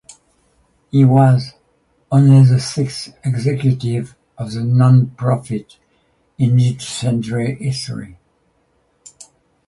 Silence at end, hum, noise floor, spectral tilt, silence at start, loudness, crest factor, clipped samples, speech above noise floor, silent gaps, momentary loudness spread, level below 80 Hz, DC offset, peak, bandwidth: 1.6 s; none; -61 dBFS; -7.5 dB/octave; 0.95 s; -16 LUFS; 16 dB; under 0.1%; 47 dB; none; 16 LU; -52 dBFS; under 0.1%; 0 dBFS; 11.5 kHz